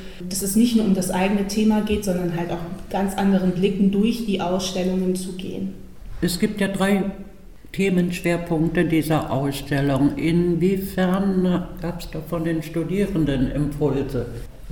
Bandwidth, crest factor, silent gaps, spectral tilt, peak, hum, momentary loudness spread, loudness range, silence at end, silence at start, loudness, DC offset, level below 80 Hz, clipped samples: 18 kHz; 16 dB; none; -6 dB/octave; -6 dBFS; none; 10 LU; 3 LU; 0 s; 0 s; -22 LUFS; 0.8%; -38 dBFS; under 0.1%